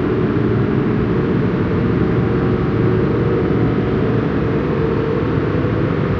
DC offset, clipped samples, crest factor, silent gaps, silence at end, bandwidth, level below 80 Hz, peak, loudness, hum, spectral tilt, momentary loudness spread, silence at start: under 0.1%; under 0.1%; 12 dB; none; 0 s; 6.2 kHz; -32 dBFS; -4 dBFS; -17 LUFS; none; -10 dB/octave; 2 LU; 0 s